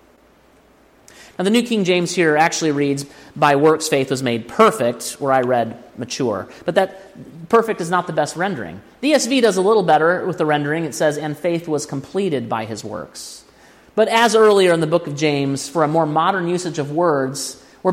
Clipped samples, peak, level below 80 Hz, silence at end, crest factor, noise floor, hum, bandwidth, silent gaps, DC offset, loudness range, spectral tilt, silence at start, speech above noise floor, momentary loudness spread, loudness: under 0.1%; 0 dBFS; -60 dBFS; 0 s; 18 dB; -52 dBFS; none; 16.5 kHz; none; under 0.1%; 5 LU; -4.5 dB/octave; 1.4 s; 34 dB; 12 LU; -18 LUFS